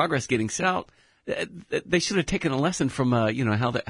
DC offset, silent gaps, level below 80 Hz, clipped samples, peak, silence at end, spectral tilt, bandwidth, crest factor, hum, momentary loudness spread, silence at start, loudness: under 0.1%; none; -50 dBFS; under 0.1%; -8 dBFS; 0.1 s; -5 dB/octave; 11 kHz; 16 dB; none; 8 LU; 0 s; -25 LUFS